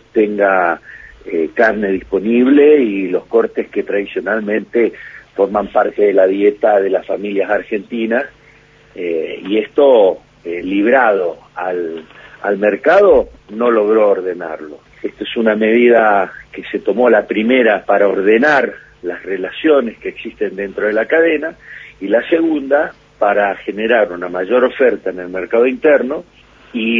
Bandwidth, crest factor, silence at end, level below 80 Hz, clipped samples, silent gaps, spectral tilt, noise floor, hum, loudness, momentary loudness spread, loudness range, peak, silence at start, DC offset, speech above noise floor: 7.2 kHz; 14 dB; 0 s; -50 dBFS; under 0.1%; none; -7 dB/octave; -46 dBFS; 50 Hz at -55 dBFS; -14 LUFS; 15 LU; 3 LU; 0 dBFS; 0.15 s; under 0.1%; 32 dB